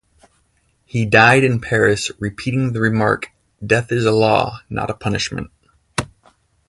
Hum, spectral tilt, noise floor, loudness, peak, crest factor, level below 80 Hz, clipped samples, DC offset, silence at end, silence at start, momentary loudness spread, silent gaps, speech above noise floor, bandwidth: none; -5.5 dB/octave; -62 dBFS; -17 LUFS; 0 dBFS; 18 dB; -46 dBFS; under 0.1%; under 0.1%; 0.6 s; 0.95 s; 15 LU; none; 45 dB; 11.5 kHz